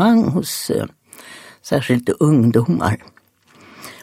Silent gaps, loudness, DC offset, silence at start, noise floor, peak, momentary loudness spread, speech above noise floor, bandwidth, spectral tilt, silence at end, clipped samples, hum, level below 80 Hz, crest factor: none; -18 LUFS; under 0.1%; 0 s; -52 dBFS; -2 dBFS; 23 LU; 36 dB; 16 kHz; -6.5 dB/octave; 0.1 s; under 0.1%; none; -52 dBFS; 18 dB